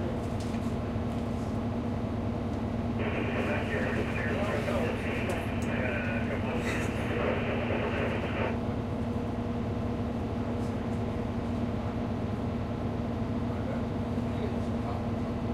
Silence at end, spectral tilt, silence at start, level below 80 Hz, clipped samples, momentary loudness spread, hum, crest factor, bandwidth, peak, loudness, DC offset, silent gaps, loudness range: 0 s; -7.5 dB/octave; 0 s; -42 dBFS; under 0.1%; 3 LU; none; 14 dB; 13.5 kHz; -16 dBFS; -32 LUFS; under 0.1%; none; 2 LU